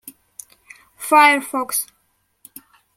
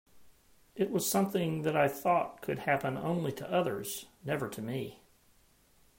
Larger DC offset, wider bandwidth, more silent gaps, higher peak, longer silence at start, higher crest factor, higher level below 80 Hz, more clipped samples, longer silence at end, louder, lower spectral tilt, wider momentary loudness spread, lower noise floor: neither; about the same, 16.5 kHz vs 16.5 kHz; neither; first, -2 dBFS vs -14 dBFS; about the same, 0.05 s vs 0.15 s; about the same, 20 dB vs 18 dB; about the same, -72 dBFS vs -68 dBFS; neither; about the same, 1.15 s vs 1.05 s; first, -16 LUFS vs -33 LUFS; second, 0 dB/octave vs -5 dB/octave; first, 21 LU vs 10 LU; about the same, -66 dBFS vs -65 dBFS